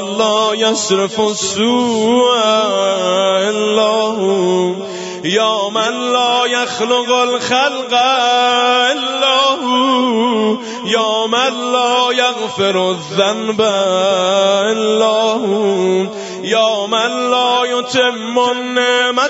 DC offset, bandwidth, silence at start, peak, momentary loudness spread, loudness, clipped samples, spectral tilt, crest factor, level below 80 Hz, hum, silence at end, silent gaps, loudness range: under 0.1%; 8 kHz; 0 s; 0 dBFS; 4 LU; -14 LUFS; under 0.1%; -3 dB/octave; 14 dB; -64 dBFS; none; 0 s; none; 2 LU